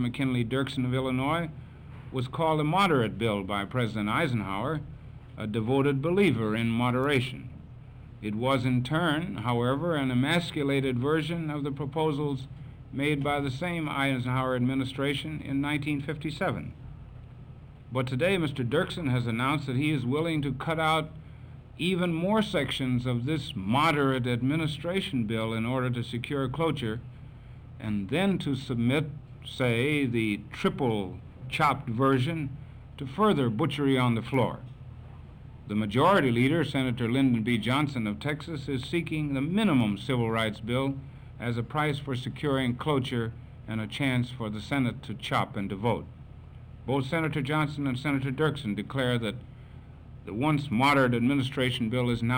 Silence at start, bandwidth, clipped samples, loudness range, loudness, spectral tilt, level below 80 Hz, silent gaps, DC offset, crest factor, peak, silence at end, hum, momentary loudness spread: 0 s; 16.5 kHz; under 0.1%; 4 LU; -28 LUFS; -6.5 dB/octave; -52 dBFS; none; under 0.1%; 16 dB; -12 dBFS; 0 s; none; 19 LU